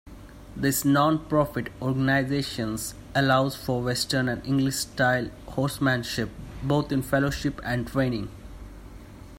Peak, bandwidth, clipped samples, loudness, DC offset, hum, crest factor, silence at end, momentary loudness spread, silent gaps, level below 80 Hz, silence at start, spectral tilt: -8 dBFS; 16 kHz; under 0.1%; -26 LUFS; under 0.1%; none; 18 dB; 0 s; 14 LU; none; -46 dBFS; 0.05 s; -5 dB/octave